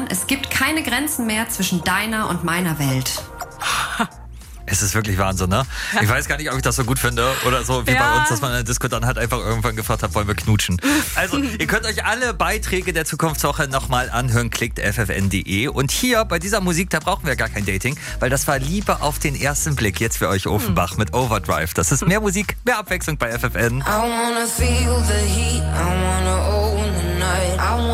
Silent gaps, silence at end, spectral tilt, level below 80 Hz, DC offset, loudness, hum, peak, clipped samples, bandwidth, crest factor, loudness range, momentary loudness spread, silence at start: none; 0 s; -4 dB/octave; -28 dBFS; under 0.1%; -19 LUFS; none; -4 dBFS; under 0.1%; 16 kHz; 16 dB; 2 LU; 4 LU; 0 s